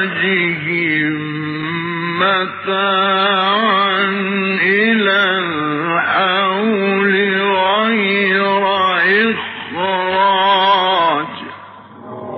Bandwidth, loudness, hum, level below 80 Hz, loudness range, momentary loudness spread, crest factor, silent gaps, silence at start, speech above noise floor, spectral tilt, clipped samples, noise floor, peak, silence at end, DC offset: 6 kHz; -14 LUFS; none; -64 dBFS; 2 LU; 9 LU; 14 dB; none; 0 s; 21 dB; -1.5 dB/octave; under 0.1%; -36 dBFS; -2 dBFS; 0 s; under 0.1%